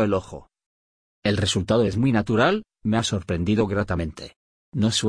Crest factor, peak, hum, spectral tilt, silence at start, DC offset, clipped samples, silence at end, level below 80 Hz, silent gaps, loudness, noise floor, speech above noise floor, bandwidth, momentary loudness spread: 16 dB; -6 dBFS; none; -5.5 dB/octave; 0 s; under 0.1%; under 0.1%; 0 s; -46 dBFS; 0.66-1.22 s, 4.36-4.72 s; -23 LUFS; under -90 dBFS; over 68 dB; 10.5 kHz; 13 LU